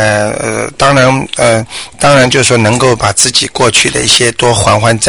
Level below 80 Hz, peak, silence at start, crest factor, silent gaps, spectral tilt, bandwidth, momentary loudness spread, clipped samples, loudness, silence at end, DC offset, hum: -34 dBFS; 0 dBFS; 0 s; 8 dB; none; -3 dB/octave; over 20 kHz; 6 LU; 0.3%; -8 LUFS; 0 s; under 0.1%; none